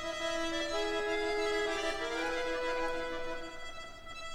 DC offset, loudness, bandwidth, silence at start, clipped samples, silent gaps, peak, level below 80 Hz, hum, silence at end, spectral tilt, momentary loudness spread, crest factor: under 0.1%; -35 LUFS; 14.5 kHz; 0 s; under 0.1%; none; -20 dBFS; -50 dBFS; none; 0 s; -2.5 dB/octave; 12 LU; 14 dB